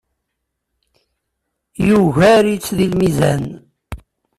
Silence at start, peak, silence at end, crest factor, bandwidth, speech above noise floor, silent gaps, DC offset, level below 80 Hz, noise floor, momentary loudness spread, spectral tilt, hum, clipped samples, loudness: 1.8 s; -2 dBFS; 0.4 s; 14 dB; 14 kHz; 62 dB; none; under 0.1%; -42 dBFS; -75 dBFS; 24 LU; -6.5 dB/octave; none; under 0.1%; -14 LUFS